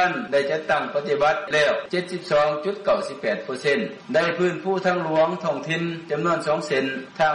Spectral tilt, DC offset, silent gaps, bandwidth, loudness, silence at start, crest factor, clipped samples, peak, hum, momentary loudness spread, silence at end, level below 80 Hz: -5 dB/octave; under 0.1%; none; 11 kHz; -23 LUFS; 0 s; 12 dB; under 0.1%; -10 dBFS; none; 6 LU; 0 s; -62 dBFS